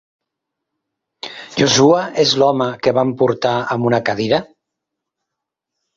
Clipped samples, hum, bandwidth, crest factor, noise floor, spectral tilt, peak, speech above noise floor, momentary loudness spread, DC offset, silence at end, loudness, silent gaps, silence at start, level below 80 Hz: under 0.1%; none; 7.6 kHz; 18 dB; -81 dBFS; -4.5 dB/octave; -2 dBFS; 66 dB; 11 LU; under 0.1%; 1.55 s; -15 LUFS; none; 1.25 s; -56 dBFS